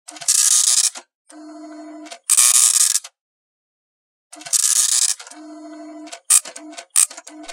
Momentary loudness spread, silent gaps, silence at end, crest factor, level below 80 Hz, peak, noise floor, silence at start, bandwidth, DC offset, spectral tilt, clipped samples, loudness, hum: 21 LU; 1.15-1.25 s, 3.21-4.30 s; 0 s; 20 dB; -76 dBFS; 0 dBFS; -38 dBFS; 0.15 s; 17 kHz; under 0.1%; 3.5 dB/octave; under 0.1%; -14 LUFS; none